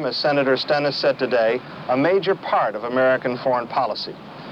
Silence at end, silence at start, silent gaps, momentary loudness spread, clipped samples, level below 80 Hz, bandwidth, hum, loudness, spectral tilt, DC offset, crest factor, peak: 0 s; 0 s; none; 6 LU; under 0.1%; -64 dBFS; 7.6 kHz; none; -21 LUFS; -6 dB/octave; under 0.1%; 14 dB; -8 dBFS